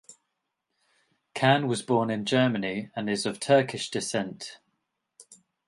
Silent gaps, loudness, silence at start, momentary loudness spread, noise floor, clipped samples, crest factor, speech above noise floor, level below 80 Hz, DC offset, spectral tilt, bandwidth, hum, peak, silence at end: none; -26 LUFS; 0.1 s; 12 LU; -81 dBFS; under 0.1%; 22 dB; 55 dB; -70 dBFS; under 0.1%; -5 dB/octave; 11.5 kHz; none; -6 dBFS; 0.35 s